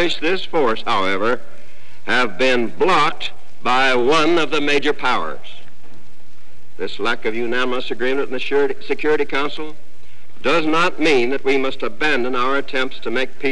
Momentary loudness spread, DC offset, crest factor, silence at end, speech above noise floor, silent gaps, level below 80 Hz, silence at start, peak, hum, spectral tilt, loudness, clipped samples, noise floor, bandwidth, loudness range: 10 LU; 10%; 12 dB; 0 s; 32 dB; none; -58 dBFS; 0 s; -8 dBFS; none; -4 dB/octave; -19 LUFS; under 0.1%; -51 dBFS; 11 kHz; 5 LU